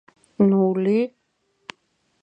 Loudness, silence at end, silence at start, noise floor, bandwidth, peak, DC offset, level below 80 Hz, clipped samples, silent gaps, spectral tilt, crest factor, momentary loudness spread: -20 LUFS; 1.15 s; 0.4 s; -70 dBFS; 7.2 kHz; -6 dBFS; under 0.1%; -70 dBFS; under 0.1%; none; -9 dB/octave; 16 dB; 24 LU